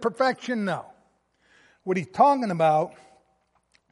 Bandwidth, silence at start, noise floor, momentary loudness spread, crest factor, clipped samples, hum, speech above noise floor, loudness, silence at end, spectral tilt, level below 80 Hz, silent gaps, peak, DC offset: 11.5 kHz; 0 s; -69 dBFS; 13 LU; 20 dB; under 0.1%; none; 45 dB; -24 LUFS; 1 s; -6.5 dB/octave; -72 dBFS; none; -6 dBFS; under 0.1%